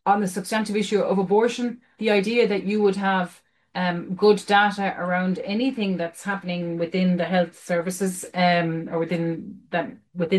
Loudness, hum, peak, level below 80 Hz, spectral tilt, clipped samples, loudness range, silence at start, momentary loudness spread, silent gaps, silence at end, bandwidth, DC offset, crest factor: -23 LUFS; none; -6 dBFS; -66 dBFS; -5.5 dB/octave; under 0.1%; 3 LU; 0.05 s; 9 LU; none; 0 s; 12.5 kHz; under 0.1%; 16 dB